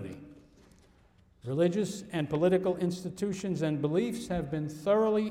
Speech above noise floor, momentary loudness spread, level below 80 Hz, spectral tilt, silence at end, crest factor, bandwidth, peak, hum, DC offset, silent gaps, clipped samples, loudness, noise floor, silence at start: 33 dB; 9 LU; -58 dBFS; -7 dB/octave; 0 s; 16 dB; 15.5 kHz; -16 dBFS; none; under 0.1%; none; under 0.1%; -30 LUFS; -62 dBFS; 0 s